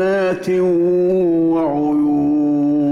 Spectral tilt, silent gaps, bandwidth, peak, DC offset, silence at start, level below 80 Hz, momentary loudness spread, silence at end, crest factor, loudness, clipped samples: -8.5 dB/octave; none; 7 kHz; -10 dBFS; under 0.1%; 0 s; -52 dBFS; 2 LU; 0 s; 6 dB; -16 LUFS; under 0.1%